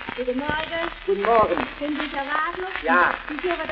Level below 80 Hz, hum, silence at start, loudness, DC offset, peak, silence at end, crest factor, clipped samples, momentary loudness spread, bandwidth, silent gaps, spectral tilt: -46 dBFS; none; 0 s; -23 LUFS; under 0.1%; -4 dBFS; 0 s; 18 dB; under 0.1%; 8 LU; 6 kHz; none; -7 dB/octave